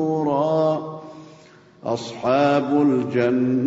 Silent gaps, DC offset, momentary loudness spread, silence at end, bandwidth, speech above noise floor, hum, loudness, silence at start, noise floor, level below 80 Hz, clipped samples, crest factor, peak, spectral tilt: none; under 0.1%; 15 LU; 0 s; 8 kHz; 29 dB; none; -20 LUFS; 0 s; -48 dBFS; -64 dBFS; under 0.1%; 14 dB; -6 dBFS; -7.5 dB/octave